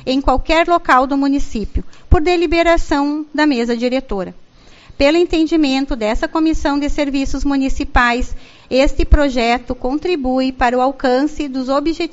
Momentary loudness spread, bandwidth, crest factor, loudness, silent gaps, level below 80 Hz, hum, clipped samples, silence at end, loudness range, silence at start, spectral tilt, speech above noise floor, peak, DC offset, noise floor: 7 LU; 8 kHz; 16 dB; -16 LUFS; none; -24 dBFS; none; under 0.1%; 0 s; 2 LU; 0.05 s; -4 dB/octave; 27 dB; 0 dBFS; under 0.1%; -41 dBFS